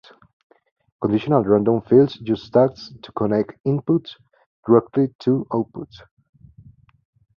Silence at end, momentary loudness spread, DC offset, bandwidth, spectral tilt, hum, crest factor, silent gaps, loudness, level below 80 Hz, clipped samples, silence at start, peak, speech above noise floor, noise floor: 1.55 s; 18 LU; under 0.1%; 6.6 kHz; -9.5 dB/octave; none; 20 dB; 3.60-3.64 s, 4.46-4.63 s, 5.15-5.19 s; -20 LUFS; -56 dBFS; under 0.1%; 1 s; -2 dBFS; 30 dB; -49 dBFS